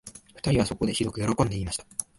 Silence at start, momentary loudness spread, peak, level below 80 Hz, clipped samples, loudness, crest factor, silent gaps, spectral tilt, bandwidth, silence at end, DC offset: 0.05 s; 7 LU; -6 dBFS; -44 dBFS; under 0.1%; -27 LUFS; 20 dB; none; -5 dB/octave; 11.5 kHz; 0.15 s; under 0.1%